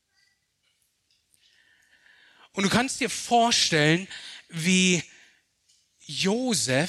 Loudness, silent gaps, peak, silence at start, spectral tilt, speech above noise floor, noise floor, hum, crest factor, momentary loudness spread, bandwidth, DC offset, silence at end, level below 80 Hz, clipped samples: -23 LUFS; none; -8 dBFS; 2.55 s; -3.5 dB/octave; 48 dB; -72 dBFS; none; 20 dB; 17 LU; 13.5 kHz; under 0.1%; 0 s; -64 dBFS; under 0.1%